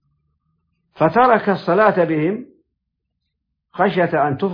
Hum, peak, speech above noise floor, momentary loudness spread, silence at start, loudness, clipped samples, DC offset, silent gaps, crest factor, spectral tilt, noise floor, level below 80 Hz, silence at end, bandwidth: none; -2 dBFS; 60 dB; 8 LU; 1 s; -17 LUFS; under 0.1%; under 0.1%; none; 16 dB; -9.5 dB/octave; -76 dBFS; -60 dBFS; 0 s; 5.2 kHz